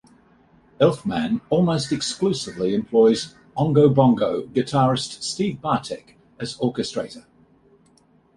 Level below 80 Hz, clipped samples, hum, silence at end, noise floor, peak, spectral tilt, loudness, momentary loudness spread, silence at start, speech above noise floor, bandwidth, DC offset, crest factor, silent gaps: -56 dBFS; under 0.1%; none; 1.15 s; -58 dBFS; -2 dBFS; -6 dB/octave; -21 LUFS; 13 LU; 0.8 s; 37 dB; 11.5 kHz; under 0.1%; 20 dB; none